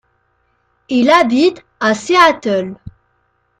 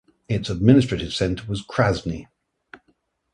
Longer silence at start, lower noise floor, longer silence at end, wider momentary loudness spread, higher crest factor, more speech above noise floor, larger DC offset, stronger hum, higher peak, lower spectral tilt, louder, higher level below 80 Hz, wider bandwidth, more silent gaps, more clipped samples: first, 0.9 s vs 0.3 s; second, -62 dBFS vs -67 dBFS; second, 0.7 s vs 1.1 s; second, 9 LU vs 12 LU; second, 16 dB vs 22 dB; first, 50 dB vs 46 dB; neither; neither; about the same, 0 dBFS vs 0 dBFS; second, -4 dB/octave vs -6.5 dB/octave; first, -13 LUFS vs -22 LUFS; second, -52 dBFS vs -42 dBFS; first, 12.5 kHz vs 11 kHz; neither; neither